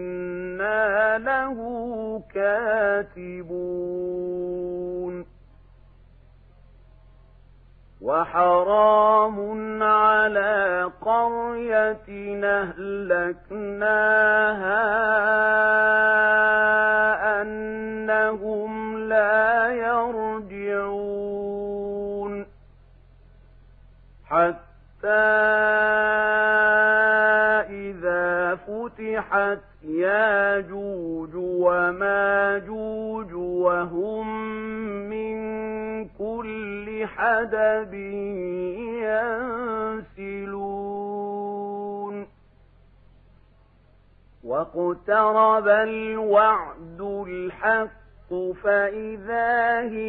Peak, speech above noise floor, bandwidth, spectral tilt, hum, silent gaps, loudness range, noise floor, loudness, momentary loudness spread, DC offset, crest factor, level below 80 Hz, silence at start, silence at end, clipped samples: -6 dBFS; 33 dB; 4.7 kHz; -8.5 dB/octave; none; none; 13 LU; -56 dBFS; -22 LUFS; 14 LU; under 0.1%; 18 dB; -54 dBFS; 0 s; 0 s; under 0.1%